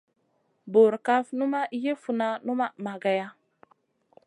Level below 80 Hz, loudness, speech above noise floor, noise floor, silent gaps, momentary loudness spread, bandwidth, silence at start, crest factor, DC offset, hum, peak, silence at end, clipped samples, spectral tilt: -84 dBFS; -26 LUFS; 46 dB; -71 dBFS; none; 9 LU; 11 kHz; 0.65 s; 18 dB; under 0.1%; none; -8 dBFS; 0.95 s; under 0.1%; -6.5 dB/octave